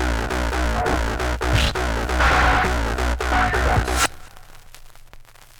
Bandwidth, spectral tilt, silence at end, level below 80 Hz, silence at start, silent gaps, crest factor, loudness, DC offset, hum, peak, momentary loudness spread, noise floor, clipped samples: 18.5 kHz; -4 dB/octave; 0.15 s; -26 dBFS; 0 s; none; 16 dB; -20 LUFS; under 0.1%; none; -4 dBFS; 7 LU; -43 dBFS; under 0.1%